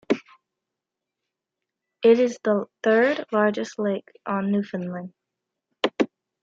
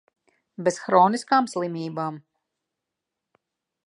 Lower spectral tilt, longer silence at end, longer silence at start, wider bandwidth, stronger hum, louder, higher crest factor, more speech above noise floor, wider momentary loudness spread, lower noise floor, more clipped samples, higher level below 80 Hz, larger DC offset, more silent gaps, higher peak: about the same, -6 dB/octave vs -5 dB/octave; second, 0.35 s vs 1.7 s; second, 0.1 s vs 0.6 s; second, 7.6 kHz vs 11.5 kHz; neither; about the same, -24 LUFS vs -23 LUFS; about the same, 20 dB vs 22 dB; about the same, 63 dB vs 62 dB; about the same, 12 LU vs 13 LU; about the same, -86 dBFS vs -85 dBFS; neither; first, -74 dBFS vs -80 dBFS; neither; neither; about the same, -6 dBFS vs -4 dBFS